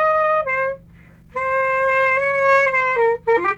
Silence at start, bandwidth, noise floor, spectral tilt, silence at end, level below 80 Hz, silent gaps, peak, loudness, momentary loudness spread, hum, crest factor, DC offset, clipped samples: 0 s; 8.4 kHz; -46 dBFS; -4.5 dB/octave; 0 s; -52 dBFS; none; -6 dBFS; -17 LUFS; 10 LU; none; 12 dB; under 0.1%; under 0.1%